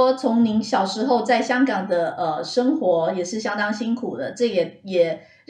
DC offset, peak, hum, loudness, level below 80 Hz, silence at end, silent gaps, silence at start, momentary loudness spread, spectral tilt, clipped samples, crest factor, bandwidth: under 0.1%; -6 dBFS; none; -21 LUFS; -72 dBFS; 0.3 s; none; 0 s; 6 LU; -5 dB/octave; under 0.1%; 14 dB; 9.8 kHz